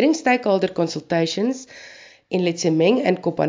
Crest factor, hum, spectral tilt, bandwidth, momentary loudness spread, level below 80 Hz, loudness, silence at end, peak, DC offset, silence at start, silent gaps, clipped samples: 16 dB; none; -5.5 dB/octave; 7.6 kHz; 15 LU; -66 dBFS; -20 LUFS; 0 s; -4 dBFS; under 0.1%; 0 s; none; under 0.1%